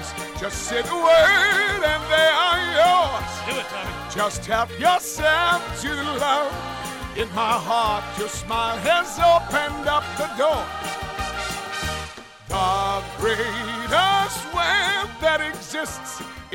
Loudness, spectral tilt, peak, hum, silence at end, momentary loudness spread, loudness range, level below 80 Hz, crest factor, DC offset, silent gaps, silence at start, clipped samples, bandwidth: -21 LUFS; -2.5 dB/octave; -8 dBFS; none; 0 s; 12 LU; 7 LU; -42 dBFS; 14 dB; under 0.1%; none; 0 s; under 0.1%; 17 kHz